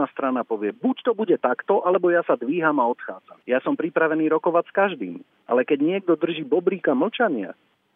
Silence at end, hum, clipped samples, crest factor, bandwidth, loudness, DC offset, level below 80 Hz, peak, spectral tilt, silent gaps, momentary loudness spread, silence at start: 0.45 s; none; under 0.1%; 18 dB; 3.9 kHz; -22 LUFS; under 0.1%; -86 dBFS; -4 dBFS; -9.5 dB/octave; none; 9 LU; 0 s